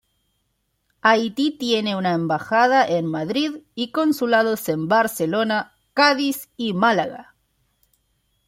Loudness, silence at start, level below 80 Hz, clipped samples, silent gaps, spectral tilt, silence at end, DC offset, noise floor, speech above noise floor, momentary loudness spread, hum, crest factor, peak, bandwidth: -20 LUFS; 1.05 s; -66 dBFS; under 0.1%; none; -4.5 dB/octave; 1.25 s; under 0.1%; -71 dBFS; 51 dB; 9 LU; none; 18 dB; -2 dBFS; 16.5 kHz